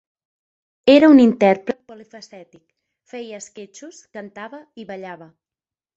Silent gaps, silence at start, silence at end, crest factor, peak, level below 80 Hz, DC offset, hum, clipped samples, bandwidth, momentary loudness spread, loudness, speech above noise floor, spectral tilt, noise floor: none; 0.85 s; 0.8 s; 18 dB; -2 dBFS; -62 dBFS; under 0.1%; none; under 0.1%; 8 kHz; 26 LU; -14 LUFS; over 72 dB; -5.5 dB/octave; under -90 dBFS